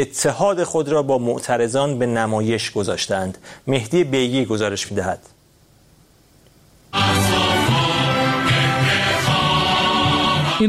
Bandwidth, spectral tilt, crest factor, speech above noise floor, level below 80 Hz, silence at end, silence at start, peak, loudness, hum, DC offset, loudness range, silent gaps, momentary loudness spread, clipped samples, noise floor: 16 kHz; -4.5 dB/octave; 16 dB; 33 dB; -46 dBFS; 0 s; 0 s; -2 dBFS; -18 LUFS; none; under 0.1%; 6 LU; none; 7 LU; under 0.1%; -53 dBFS